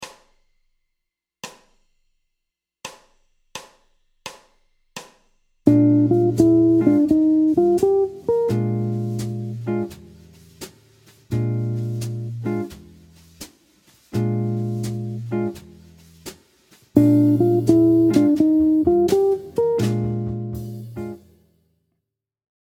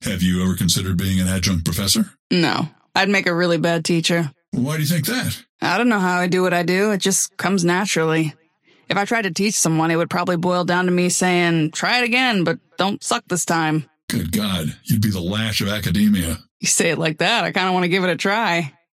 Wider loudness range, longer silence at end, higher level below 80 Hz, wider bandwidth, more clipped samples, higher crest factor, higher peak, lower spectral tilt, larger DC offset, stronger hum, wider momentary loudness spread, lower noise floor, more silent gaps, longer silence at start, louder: first, 11 LU vs 2 LU; first, 1.45 s vs 0.25 s; second, -52 dBFS vs -46 dBFS; about the same, 16 kHz vs 16.5 kHz; neither; first, 22 dB vs 16 dB; first, 0 dBFS vs -4 dBFS; first, -8.5 dB/octave vs -4 dB/octave; neither; neither; first, 24 LU vs 6 LU; first, -81 dBFS vs -57 dBFS; second, none vs 2.19-2.30 s, 4.48-4.52 s, 5.49-5.59 s, 14.03-14.08 s, 16.51-16.60 s; about the same, 0 s vs 0 s; about the same, -19 LUFS vs -19 LUFS